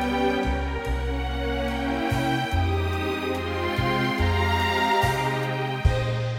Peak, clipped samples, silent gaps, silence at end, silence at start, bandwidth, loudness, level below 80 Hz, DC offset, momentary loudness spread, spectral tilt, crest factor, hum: -8 dBFS; under 0.1%; none; 0 s; 0 s; 16.5 kHz; -25 LUFS; -32 dBFS; under 0.1%; 6 LU; -6 dB/octave; 16 dB; none